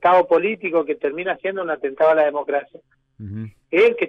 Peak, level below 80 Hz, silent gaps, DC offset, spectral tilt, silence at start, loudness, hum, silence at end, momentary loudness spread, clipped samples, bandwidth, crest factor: -6 dBFS; -64 dBFS; none; under 0.1%; -7 dB/octave; 0 s; -20 LUFS; none; 0 s; 17 LU; under 0.1%; 6.2 kHz; 12 dB